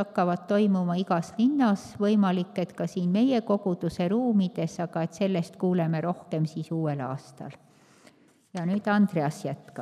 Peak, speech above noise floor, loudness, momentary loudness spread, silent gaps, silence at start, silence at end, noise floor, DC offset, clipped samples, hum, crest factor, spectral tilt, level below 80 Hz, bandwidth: -12 dBFS; 32 dB; -27 LUFS; 10 LU; none; 0 s; 0 s; -58 dBFS; under 0.1%; under 0.1%; none; 16 dB; -7.5 dB/octave; -68 dBFS; 12 kHz